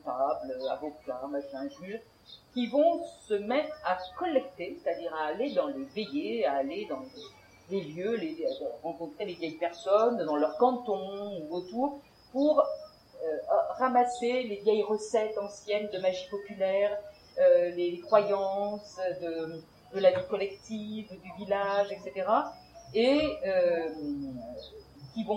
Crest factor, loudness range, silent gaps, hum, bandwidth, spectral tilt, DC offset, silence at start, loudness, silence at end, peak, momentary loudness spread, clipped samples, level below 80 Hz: 20 dB; 5 LU; none; none; 10.5 kHz; -5.5 dB/octave; under 0.1%; 0.05 s; -30 LUFS; 0 s; -10 dBFS; 14 LU; under 0.1%; -66 dBFS